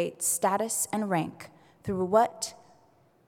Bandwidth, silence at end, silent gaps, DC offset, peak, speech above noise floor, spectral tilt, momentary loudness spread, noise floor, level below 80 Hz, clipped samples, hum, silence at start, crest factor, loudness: 18 kHz; 0.75 s; none; under 0.1%; -10 dBFS; 35 dB; -4 dB/octave; 13 LU; -63 dBFS; -66 dBFS; under 0.1%; none; 0 s; 20 dB; -28 LUFS